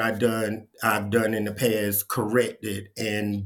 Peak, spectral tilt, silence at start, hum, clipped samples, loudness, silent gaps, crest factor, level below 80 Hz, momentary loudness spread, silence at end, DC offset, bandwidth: -6 dBFS; -4.5 dB/octave; 0 s; none; under 0.1%; -25 LUFS; none; 20 dB; -66 dBFS; 7 LU; 0 s; under 0.1%; 18 kHz